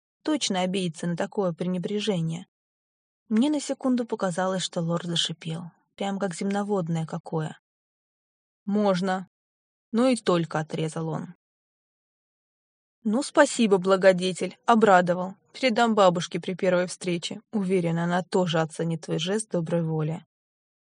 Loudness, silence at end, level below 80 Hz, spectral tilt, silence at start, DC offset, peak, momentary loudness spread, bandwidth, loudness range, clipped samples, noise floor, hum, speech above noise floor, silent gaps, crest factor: -25 LUFS; 0.7 s; -76 dBFS; -5 dB/octave; 0.25 s; under 0.1%; -4 dBFS; 11 LU; 10.5 kHz; 7 LU; under 0.1%; under -90 dBFS; none; over 65 dB; 2.48-3.26 s, 7.20-7.24 s, 7.59-8.66 s, 9.27-9.92 s, 11.35-13.02 s; 22 dB